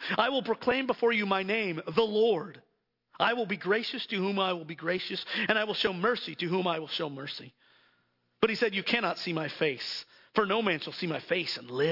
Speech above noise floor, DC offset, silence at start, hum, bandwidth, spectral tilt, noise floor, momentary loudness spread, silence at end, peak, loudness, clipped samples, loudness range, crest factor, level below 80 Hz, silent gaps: 43 dB; under 0.1%; 0 s; none; 5.8 kHz; -5.5 dB/octave; -73 dBFS; 7 LU; 0 s; -10 dBFS; -30 LUFS; under 0.1%; 3 LU; 22 dB; -72 dBFS; none